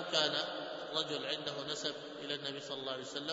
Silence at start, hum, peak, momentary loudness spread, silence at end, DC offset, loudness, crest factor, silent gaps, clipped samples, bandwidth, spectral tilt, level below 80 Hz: 0 s; none; -16 dBFS; 8 LU; 0 s; under 0.1%; -38 LUFS; 24 dB; none; under 0.1%; 7.6 kHz; -0.5 dB/octave; -82 dBFS